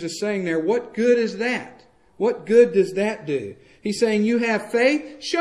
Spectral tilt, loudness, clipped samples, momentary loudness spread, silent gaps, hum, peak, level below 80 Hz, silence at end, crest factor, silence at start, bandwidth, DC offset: -5 dB/octave; -21 LUFS; under 0.1%; 11 LU; none; none; -4 dBFS; -66 dBFS; 0 s; 18 dB; 0 s; 12 kHz; under 0.1%